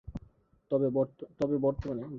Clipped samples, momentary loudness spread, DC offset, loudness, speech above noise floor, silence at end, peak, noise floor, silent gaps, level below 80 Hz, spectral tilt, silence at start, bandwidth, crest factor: under 0.1%; 13 LU; under 0.1%; -31 LUFS; 30 dB; 0 s; -16 dBFS; -61 dBFS; none; -52 dBFS; -10 dB/octave; 0.05 s; 7 kHz; 16 dB